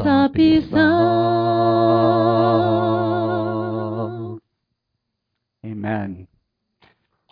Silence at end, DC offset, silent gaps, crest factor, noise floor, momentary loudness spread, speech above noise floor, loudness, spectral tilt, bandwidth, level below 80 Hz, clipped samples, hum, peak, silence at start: 1.05 s; under 0.1%; none; 16 dB; -78 dBFS; 16 LU; 62 dB; -18 LUFS; -9.5 dB/octave; 5.2 kHz; -50 dBFS; under 0.1%; none; -4 dBFS; 0 s